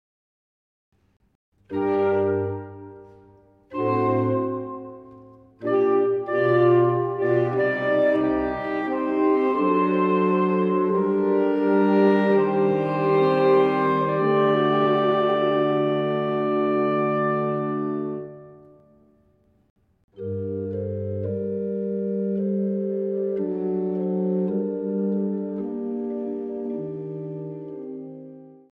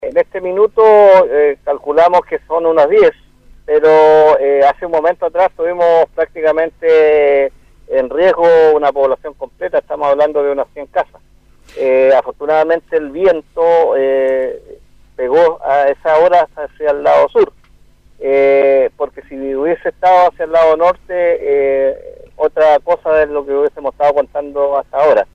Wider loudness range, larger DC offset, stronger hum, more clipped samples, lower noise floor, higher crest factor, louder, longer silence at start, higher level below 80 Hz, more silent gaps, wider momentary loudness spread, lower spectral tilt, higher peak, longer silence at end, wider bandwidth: first, 10 LU vs 4 LU; neither; second, none vs 50 Hz at -55 dBFS; neither; first, -62 dBFS vs -45 dBFS; about the same, 16 dB vs 12 dB; second, -23 LUFS vs -12 LUFS; first, 1.7 s vs 0 s; second, -60 dBFS vs -46 dBFS; first, 19.70-19.76 s, 20.04-20.08 s vs none; first, 14 LU vs 10 LU; first, -9.5 dB/octave vs -6 dB/octave; second, -8 dBFS vs 0 dBFS; first, 0.25 s vs 0.1 s; second, 5 kHz vs 7 kHz